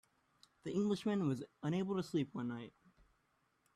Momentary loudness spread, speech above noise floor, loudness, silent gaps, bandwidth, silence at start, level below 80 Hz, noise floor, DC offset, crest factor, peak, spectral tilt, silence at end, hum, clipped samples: 12 LU; 41 dB; -39 LUFS; none; 12.5 kHz; 0.65 s; -76 dBFS; -79 dBFS; under 0.1%; 16 dB; -24 dBFS; -7 dB/octave; 1.05 s; none; under 0.1%